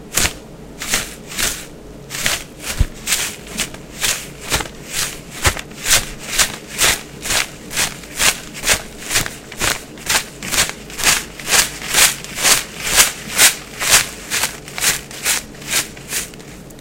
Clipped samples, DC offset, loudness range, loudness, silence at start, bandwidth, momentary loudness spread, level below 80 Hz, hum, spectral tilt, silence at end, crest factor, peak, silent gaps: under 0.1%; under 0.1%; 7 LU; -17 LUFS; 0 s; 17 kHz; 11 LU; -34 dBFS; none; -0.5 dB/octave; 0 s; 20 dB; 0 dBFS; none